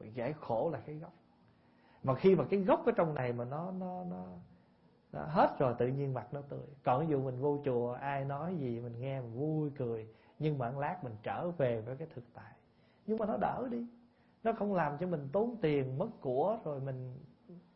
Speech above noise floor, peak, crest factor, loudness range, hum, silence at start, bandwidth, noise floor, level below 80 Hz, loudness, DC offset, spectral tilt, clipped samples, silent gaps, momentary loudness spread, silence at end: 32 dB; -16 dBFS; 20 dB; 5 LU; none; 0 s; 5.6 kHz; -67 dBFS; -68 dBFS; -35 LUFS; under 0.1%; -7.5 dB/octave; under 0.1%; none; 17 LU; 0.15 s